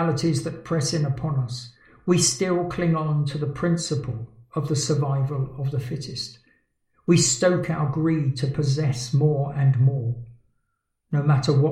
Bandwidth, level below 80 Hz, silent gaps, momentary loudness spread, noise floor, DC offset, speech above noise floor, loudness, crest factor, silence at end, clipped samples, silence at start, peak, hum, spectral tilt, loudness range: 12.5 kHz; -54 dBFS; none; 12 LU; -75 dBFS; under 0.1%; 53 dB; -23 LUFS; 18 dB; 0 s; under 0.1%; 0 s; -6 dBFS; none; -5.5 dB/octave; 4 LU